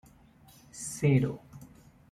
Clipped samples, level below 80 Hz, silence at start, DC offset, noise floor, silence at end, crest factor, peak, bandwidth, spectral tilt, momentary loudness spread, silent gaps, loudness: under 0.1%; -62 dBFS; 0.75 s; under 0.1%; -58 dBFS; 0.45 s; 20 dB; -14 dBFS; 14 kHz; -6.5 dB/octave; 25 LU; none; -29 LUFS